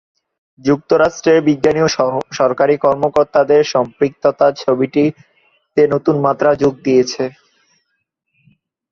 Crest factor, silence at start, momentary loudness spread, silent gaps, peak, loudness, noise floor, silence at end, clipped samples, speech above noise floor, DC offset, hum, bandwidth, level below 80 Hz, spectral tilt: 14 dB; 0.65 s; 6 LU; none; -2 dBFS; -15 LUFS; -71 dBFS; 1.6 s; under 0.1%; 57 dB; under 0.1%; none; 7.2 kHz; -54 dBFS; -6 dB/octave